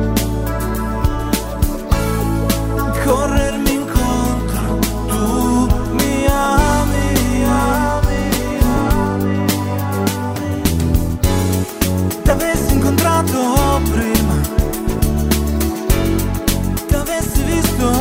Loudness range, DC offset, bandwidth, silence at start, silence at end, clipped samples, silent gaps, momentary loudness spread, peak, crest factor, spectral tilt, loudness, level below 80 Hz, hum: 2 LU; under 0.1%; 16.5 kHz; 0 s; 0 s; under 0.1%; none; 5 LU; 0 dBFS; 16 dB; -5.5 dB/octave; -17 LUFS; -22 dBFS; none